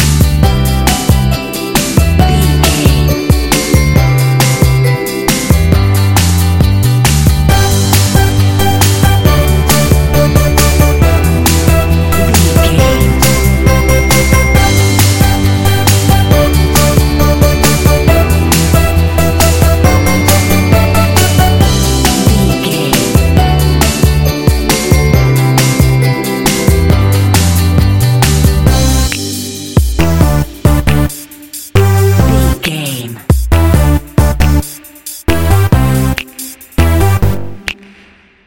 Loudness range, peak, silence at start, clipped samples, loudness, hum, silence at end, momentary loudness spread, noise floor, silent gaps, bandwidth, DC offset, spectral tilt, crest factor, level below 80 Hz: 3 LU; 0 dBFS; 0 s; 0.3%; -10 LUFS; none; 0 s; 5 LU; -42 dBFS; none; 17.5 kHz; 3%; -5 dB/octave; 8 dB; -14 dBFS